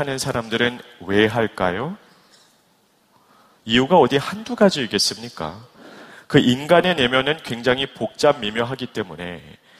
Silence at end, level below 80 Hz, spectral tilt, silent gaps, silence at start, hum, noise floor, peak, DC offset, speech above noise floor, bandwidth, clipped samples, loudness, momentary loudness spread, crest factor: 0.3 s; -52 dBFS; -4.5 dB/octave; none; 0 s; none; -60 dBFS; 0 dBFS; under 0.1%; 40 dB; 15.5 kHz; under 0.1%; -19 LUFS; 16 LU; 20 dB